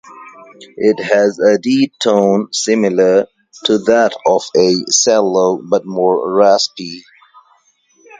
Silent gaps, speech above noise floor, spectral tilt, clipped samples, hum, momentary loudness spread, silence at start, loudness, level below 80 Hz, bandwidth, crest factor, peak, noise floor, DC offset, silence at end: none; 42 dB; -3.5 dB/octave; under 0.1%; none; 6 LU; 0.1 s; -13 LUFS; -60 dBFS; 9.6 kHz; 14 dB; 0 dBFS; -55 dBFS; under 0.1%; 1.2 s